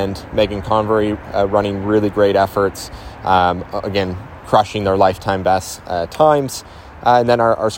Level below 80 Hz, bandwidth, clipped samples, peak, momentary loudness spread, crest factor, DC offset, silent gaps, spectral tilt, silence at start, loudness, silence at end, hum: -40 dBFS; 16.5 kHz; under 0.1%; 0 dBFS; 10 LU; 16 dB; under 0.1%; none; -5.5 dB/octave; 0 s; -17 LUFS; 0 s; none